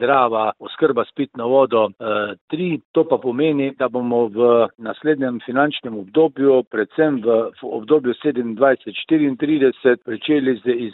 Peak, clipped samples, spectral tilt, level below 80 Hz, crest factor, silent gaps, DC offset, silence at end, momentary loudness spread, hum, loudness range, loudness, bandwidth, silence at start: -2 dBFS; under 0.1%; -10.5 dB/octave; -66 dBFS; 16 dB; 2.41-2.48 s, 2.85-2.94 s, 6.67-6.71 s; under 0.1%; 0 s; 7 LU; none; 1 LU; -19 LUFS; 4.1 kHz; 0 s